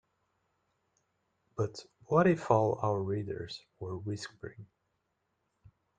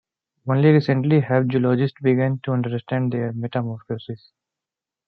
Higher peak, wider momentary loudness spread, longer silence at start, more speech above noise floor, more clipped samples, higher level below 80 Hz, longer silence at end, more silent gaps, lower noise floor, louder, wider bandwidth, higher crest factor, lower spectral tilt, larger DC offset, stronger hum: second, -10 dBFS vs -4 dBFS; first, 19 LU vs 15 LU; first, 1.55 s vs 0.45 s; second, 49 dB vs 68 dB; neither; about the same, -68 dBFS vs -64 dBFS; first, 1.35 s vs 0.9 s; neither; second, -80 dBFS vs -88 dBFS; second, -32 LUFS vs -21 LUFS; first, 9.4 kHz vs 5.4 kHz; first, 24 dB vs 18 dB; second, -7 dB/octave vs -10.5 dB/octave; neither; neither